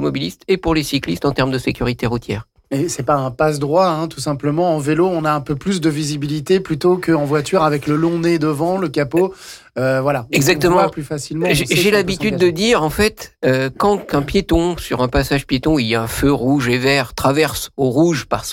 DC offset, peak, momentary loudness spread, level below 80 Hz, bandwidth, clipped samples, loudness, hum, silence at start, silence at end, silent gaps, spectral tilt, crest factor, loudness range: under 0.1%; -4 dBFS; 6 LU; -36 dBFS; 17 kHz; under 0.1%; -17 LUFS; none; 0 s; 0 s; none; -5.5 dB/octave; 12 dB; 3 LU